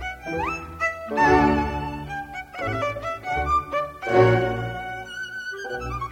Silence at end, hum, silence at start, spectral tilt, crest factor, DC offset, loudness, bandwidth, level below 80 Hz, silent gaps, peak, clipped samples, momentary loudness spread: 0 s; none; 0 s; -6.5 dB/octave; 20 dB; under 0.1%; -24 LUFS; 16.5 kHz; -40 dBFS; none; -4 dBFS; under 0.1%; 14 LU